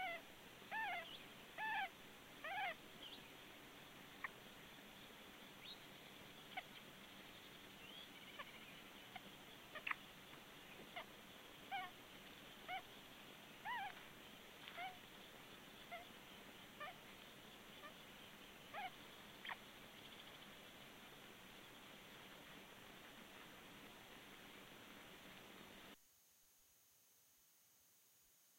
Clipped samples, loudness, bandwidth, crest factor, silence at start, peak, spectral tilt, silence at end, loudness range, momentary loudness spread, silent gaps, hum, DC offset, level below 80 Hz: under 0.1%; -54 LUFS; 16 kHz; 28 dB; 0 s; -28 dBFS; -2.5 dB/octave; 0 s; 9 LU; 11 LU; none; none; under 0.1%; -78 dBFS